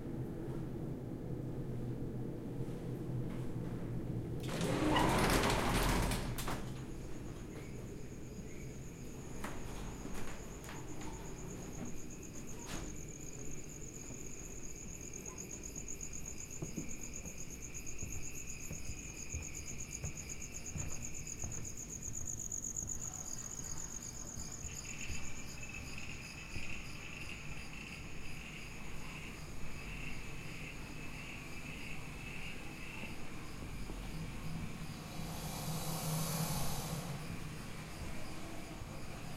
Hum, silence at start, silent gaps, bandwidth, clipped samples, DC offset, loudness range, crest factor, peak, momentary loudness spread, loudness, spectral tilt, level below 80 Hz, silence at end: none; 0 s; none; 16 kHz; under 0.1%; under 0.1%; 11 LU; 24 dB; -16 dBFS; 10 LU; -43 LUFS; -4 dB/octave; -50 dBFS; 0 s